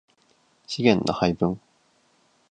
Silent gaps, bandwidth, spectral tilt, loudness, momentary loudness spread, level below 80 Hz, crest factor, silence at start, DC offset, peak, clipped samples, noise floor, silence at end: none; 9.4 kHz; -6 dB/octave; -23 LUFS; 13 LU; -54 dBFS; 24 dB; 0.7 s; under 0.1%; -2 dBFS; under 0.1%; -64 dBFS; 0.9 s